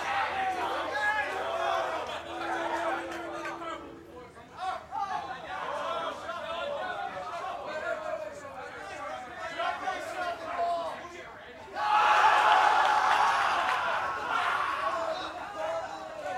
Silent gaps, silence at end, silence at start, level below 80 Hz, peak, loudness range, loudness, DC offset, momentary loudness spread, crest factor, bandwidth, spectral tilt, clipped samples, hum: none; 0 s; 0 s; -66 dBFS; -8 dBFS; 11 LU; -30 LUFS; under 0.1%; 17 LU; 22 dB; 15.5 kHz; -2.5 dB/octave; under 0.1%; none